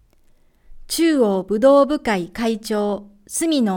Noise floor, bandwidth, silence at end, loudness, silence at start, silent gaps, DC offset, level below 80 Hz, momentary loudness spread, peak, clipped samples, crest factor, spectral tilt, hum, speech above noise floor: -54 dBFS; 18 kHz; 0 s; -19 LUFS; 0.7 s; none; under 0.1%; -48 dBFS; 11 LU; -4 dBFS; under 0.1%; 16 dB; -4.5 dB/octave; none; 36 dB